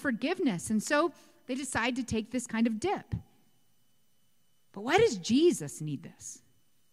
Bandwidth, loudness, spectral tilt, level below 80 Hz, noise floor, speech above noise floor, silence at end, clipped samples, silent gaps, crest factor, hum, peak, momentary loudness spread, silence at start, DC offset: 15.5 kHz; -30 LUFS; -4.5 dB/octave; -60 dBFS; -74 dBFS; 44 dB; 0.55 s; under 0.1%; none; 20 dB; none; -12 dBFS; 15 LU; 0 s; under 0.1%